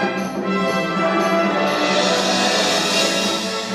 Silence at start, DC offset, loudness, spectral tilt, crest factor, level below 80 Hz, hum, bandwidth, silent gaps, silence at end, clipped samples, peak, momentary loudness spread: 0 s; under 0.1%; -18 LUFS; -3 dB/octave; 16 dB; -58 dBFS; none; 15.5 kHz; none; 0 s; under 0.1%; -4 dBFS; 5 LU